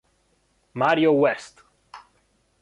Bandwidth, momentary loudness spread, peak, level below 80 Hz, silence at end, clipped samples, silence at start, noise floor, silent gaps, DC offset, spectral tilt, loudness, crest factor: 11 kHz; 15 LU; -6 dBFS; -68 dBFS; 0.65 s; under 0.1%; 0.75 s; -66 dBFS; none; under 0.1%; -6 dB/octave; -21 LUFS; 20 dB